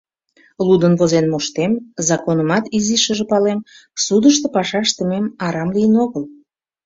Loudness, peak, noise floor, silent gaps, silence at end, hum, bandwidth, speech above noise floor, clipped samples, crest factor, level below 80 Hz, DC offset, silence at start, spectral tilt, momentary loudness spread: -16 LUFS; -2 dBFS; -55 dBFS; none; 0.55 s; none; 7.8 kHz; 39 dB; under 0.1%; 16 dB; -56 dBFS; under 0.1%; 0.6 s; -4.5 dB/octave; 8 LU